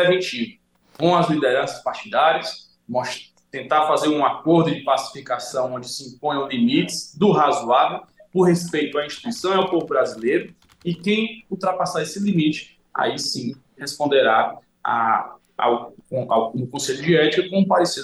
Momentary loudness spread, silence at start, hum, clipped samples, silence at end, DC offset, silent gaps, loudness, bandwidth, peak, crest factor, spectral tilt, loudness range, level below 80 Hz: 12 LU; 0 s; none; under 0.1%; 0 s; under 0.1%; none; -21 LUFS; 12.5 kHz; -6 dBFS; 16 dB; -5 dB/octave; 3 LU; -66 dBFS